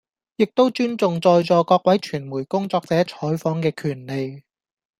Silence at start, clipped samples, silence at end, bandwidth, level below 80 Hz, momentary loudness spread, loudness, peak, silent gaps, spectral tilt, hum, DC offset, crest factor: 0.4 s; under 0.1%; 0.6 s; 15 kHz; -64 dBFS; 11 LU; -20 LUFS; -4 dBFS; none; -7 dB/octave; none; under 0.1%; 18 dB